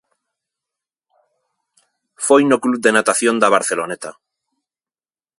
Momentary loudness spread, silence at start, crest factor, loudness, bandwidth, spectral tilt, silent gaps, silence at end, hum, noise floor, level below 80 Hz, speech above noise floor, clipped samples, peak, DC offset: 13 LU; 2.2 s; 20 dB; -15 LUFS; 11.5 kHz; -3 dB/octave; none; 1.3 s; none; under -90 dBFS; -68 dBFS; over 75 dB; under 0.1%; 0 dBFS; under 0.1%